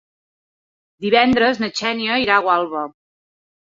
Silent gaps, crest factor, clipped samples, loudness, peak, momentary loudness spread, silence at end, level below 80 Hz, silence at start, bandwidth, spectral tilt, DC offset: none; 18 dB; under 0.1%; -17 LUFS; -2 dBFS; 13 LU; 0.8 s; -54 dBFS; 1 s; 7.6 kHz; -4 dB/octave; under 0.1%